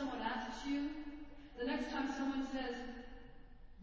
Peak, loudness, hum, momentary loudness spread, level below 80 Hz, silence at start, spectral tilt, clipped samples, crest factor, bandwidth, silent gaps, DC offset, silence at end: -26 dBFS; -42 LUFS; none; 15 LU; -60 dBFS; 0 s; -4.5 dB/octave; under 0.1%; 16 dB; 7.8 kHz; none; under 0.1%; 0 s